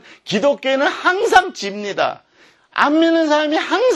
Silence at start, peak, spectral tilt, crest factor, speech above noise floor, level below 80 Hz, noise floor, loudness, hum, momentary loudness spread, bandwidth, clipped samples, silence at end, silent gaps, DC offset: 0.25 s; 0 dBFS; -3.5 dB/octave; 16 dB; 36 dB; -58 dBFS; -52 dBFS; -17 LUFS; none; 11 LU; 12.5 kHz; under 0.1%; 0 s; none; under 0.1%